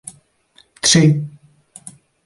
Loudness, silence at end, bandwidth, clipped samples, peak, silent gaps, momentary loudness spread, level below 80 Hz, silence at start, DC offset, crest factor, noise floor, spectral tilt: -14 LUFS; 0.95 s; 11.5 kHz; under 0.1%; -2 dBFS; none; 26 LU; -52 dBFS; 0.85 s; under 0.1%; 18 dB; -55 dBFS; -4 dB/octave